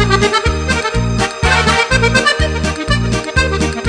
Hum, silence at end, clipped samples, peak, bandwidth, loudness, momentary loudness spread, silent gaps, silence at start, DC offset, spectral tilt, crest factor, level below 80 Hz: none; 0 s; under 0.1%; 0 dBFS; 10 kHz; -13 LUFS; 5 LU; none; 0 s; under 0.1%; -4.5 dB/octave; 14 dB; -22 dBFS